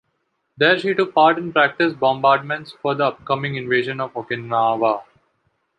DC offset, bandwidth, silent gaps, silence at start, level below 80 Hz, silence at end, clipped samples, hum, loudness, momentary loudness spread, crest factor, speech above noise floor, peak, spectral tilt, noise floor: under 0.1%; 9 kHz; none; 0.6 s; -64 dBFS; 0.75 s; under 0.1%; none; -19 LUFS; 10 LU; 18 dB; 52 dB; -2 dBFS; -7 dB/octave; -71 dBFS